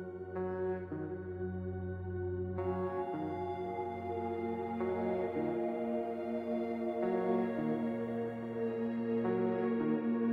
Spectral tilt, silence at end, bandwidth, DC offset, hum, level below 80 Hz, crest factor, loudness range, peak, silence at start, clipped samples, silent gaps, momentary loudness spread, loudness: -10 dB/octave; 0 s; 5.2 kHz; under 0.1%; none; -68 dBFS; 14 dB; 4 LU; -22 dBFS; 0 s; under 0.1%; none; 7 LU; -37 LUFS